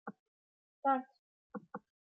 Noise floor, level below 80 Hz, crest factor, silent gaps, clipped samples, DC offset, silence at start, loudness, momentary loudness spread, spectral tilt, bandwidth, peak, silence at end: under -90 dBFS; under -90 dBFS; 22 dB; 0.19-0.83 s, 1.19-1.50 s; under 0.1%; under 0.1%; 0.05 s; -37 LUFS; 18 LU; -5 dB/octave; 4.5 kHz; -20 dBFS; 0.4 s